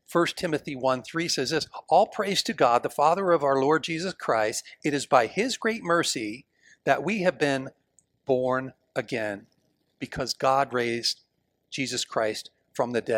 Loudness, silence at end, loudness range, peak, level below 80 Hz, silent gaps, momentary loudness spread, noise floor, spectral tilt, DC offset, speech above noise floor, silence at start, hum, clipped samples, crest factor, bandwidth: -26 LUFS; 0 s; 5 LU; -6 dBFS; -64 dBFS; none; 12 LU; -69 dBFS; -3.5 dB/octave; under 0.1%; 43 dB; 0.1 s; none; under 0.1%; 20 dB; 17.5 kHz